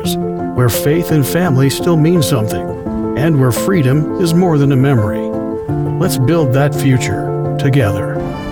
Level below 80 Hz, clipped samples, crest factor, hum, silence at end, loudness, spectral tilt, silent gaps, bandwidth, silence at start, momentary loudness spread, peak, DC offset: -38 dBFS; under 0.1%; 12 dB; none; 0 s; -14 LUFS; -6.5 dB/octave; none; 19.5 kHz; 0 s; 7 LU; -2 dBFS; under 0.1%